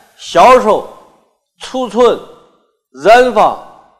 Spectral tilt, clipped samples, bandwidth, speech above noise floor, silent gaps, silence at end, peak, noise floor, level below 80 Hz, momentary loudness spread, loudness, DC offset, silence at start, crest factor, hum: -4 dB/octave; 0.3%; 14.5 kHz; 45 dB; none; 0.4 s; 0 dBFS; -54 dBFS; -44 dBFS; 16 LU; -10 LUFS; under 0.1%; 0.2 s; 12 dB; none